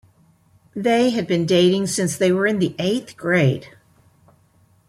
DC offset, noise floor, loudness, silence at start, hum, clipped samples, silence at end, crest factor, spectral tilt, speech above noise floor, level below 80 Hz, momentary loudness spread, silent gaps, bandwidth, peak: under 0.1%; -57 dBFS; -19 LUFS; 0.75 s; none; under 0.1%; 1.2 s; 16 dB; -5 dB/octave; 39 dB; -60 dBFS; 8 LU; none; 15.5 kHz; -6 dBFS